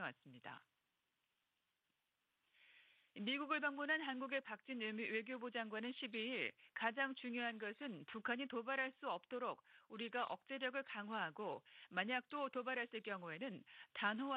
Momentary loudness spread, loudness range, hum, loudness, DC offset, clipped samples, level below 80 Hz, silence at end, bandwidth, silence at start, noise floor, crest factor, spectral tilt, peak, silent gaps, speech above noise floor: 10 LU; 3 LU; none; -45 LUFS; under 0.1%; under 0.1%; under -90 dBFS; 0 s; 5.2 kHz; 0 s; -89 dBFS; 22 dB; -6 dB/octave; -24 dBFS; none; 43 dB